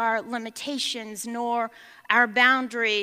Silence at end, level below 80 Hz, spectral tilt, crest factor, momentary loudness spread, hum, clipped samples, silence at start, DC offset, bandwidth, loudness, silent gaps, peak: 0 s; -80 dBFS; -1.5 dB/octave; 22 dB; 14 LU; none; under 0.1%; 0 s; under 0.1%; 15.5 kHz; -24 LUFS; none; -4 dBFS